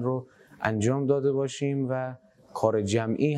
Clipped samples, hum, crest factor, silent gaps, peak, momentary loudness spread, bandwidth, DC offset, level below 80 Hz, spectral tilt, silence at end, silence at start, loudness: under 0.1%; none; 18 dB; none; -8 dBFS; 8 LU; 11.5 kHz; under 0.1%; -70 dBFS; -6.5 dB/octave; 0 s; 0 s; -27 LUFS